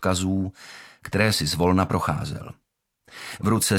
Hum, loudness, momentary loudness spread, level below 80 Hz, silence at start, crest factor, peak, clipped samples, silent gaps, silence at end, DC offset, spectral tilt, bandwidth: none; -24 LUFS; 20 LU; -48 dBFS; 0 s; 20 dB; -4 dBFS; under 0.1%; none; 0 s; under 0.1%; -4.5 dB/octave; 18 kHz